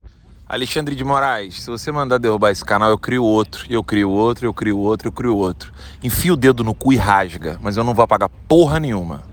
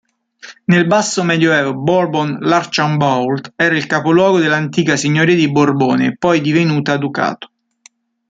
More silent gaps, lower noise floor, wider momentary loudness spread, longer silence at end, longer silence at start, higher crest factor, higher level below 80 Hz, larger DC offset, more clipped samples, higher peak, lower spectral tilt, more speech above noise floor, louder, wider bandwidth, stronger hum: neither; second, -43 dBFS vs -50 dBFS; first, 10 LU vs 5 LU; second, 0 s vs 0.85 s; second, 0.05 s vs 0.45 s; about the same, 16 dB vs 14 dB; first, -38 dBFS vs -56 dBFS; neither; neither; about the same, 0 dBFS vs -2 dBFS; about the same, -6 dB/octave vs -5.5 dB/octave; second, 26 dB vs 36 dB; second, -17 LUFS vs -14 LUFS; first, over 20 kHz vs 9.4 kHz; neither